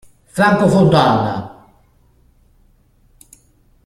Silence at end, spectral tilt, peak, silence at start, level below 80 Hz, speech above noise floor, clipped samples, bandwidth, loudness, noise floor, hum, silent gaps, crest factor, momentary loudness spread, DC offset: 2.4 s; -6.5 dB/octave; 0 dBFS; 0.35 s; -48 dBFS; 41 dB; under 0.1%; 13.5 kHz; -14 LUFS; -54 dBFS; none; none; 18 dB; 16 LU; under 0.1%